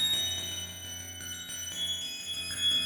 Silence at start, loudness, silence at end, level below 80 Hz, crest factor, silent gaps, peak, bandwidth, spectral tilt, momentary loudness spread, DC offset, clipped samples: 0 s; -32 LUFS; 0 s; -62 dBFS; 14 dB; none; -18 dBFS; 19.5 kHz; 0 dB/octave; 11 LU; under 0.1%; under 0.1%